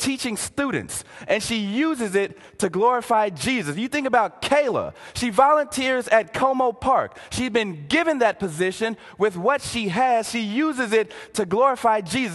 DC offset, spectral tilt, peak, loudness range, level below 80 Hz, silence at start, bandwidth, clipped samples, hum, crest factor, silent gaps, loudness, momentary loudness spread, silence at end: under 0.1%; -4 dB/octave; -2 dBFS; 2 LU; -52 dBFS; 0 s; 12.5 kHz; under 0.1%; none; 20 dB; none; -22 LUFS; 9 LU; 0 s